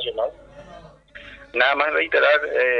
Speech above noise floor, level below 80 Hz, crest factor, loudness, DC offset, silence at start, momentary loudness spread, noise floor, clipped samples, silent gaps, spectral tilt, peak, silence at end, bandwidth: 26 dB; -54 dBFS; 18 dB; -19 LUFS; under 0.1%; 0 s; 17 LU; -45 dBFS; under 0.1%; none; -4 dB/octave; -4 dBFS; 0 s; 6.6 kHz